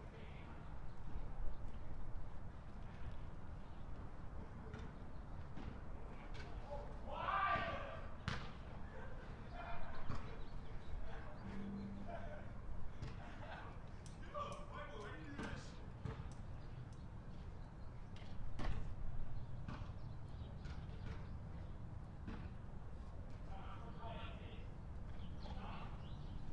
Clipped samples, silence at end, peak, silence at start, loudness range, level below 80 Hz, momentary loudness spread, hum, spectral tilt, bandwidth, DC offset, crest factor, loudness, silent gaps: under 0.1%; 0 s; -26 dBFS; 0 s; 9 LU; -52 dBFS; 7 LU; none; -6.5 dB/octave; 8.8 kHz; under 0.1%; 18 dB; -51 LUFS; none